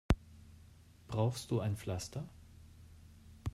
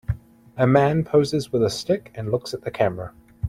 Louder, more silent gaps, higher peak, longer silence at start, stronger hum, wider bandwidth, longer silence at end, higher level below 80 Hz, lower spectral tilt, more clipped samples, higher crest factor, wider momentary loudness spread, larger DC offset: second, -38 LUFS vs -22 LUFS; neither; second, -16 dBFS vs -4 dBFS; about the same, 0.1 s vs 0.1 s; neither; about the same, 15 kHz vs 15 kHz; about the same, 0 s vs 0 s; about the same, -48 dBFS vs -46 dBFS; about the same, -6.5 dB/octave vs -6.5 dB/octave; neither; first, 24 dB vs 18 dB; first, 23 LU vs 15 LU; neither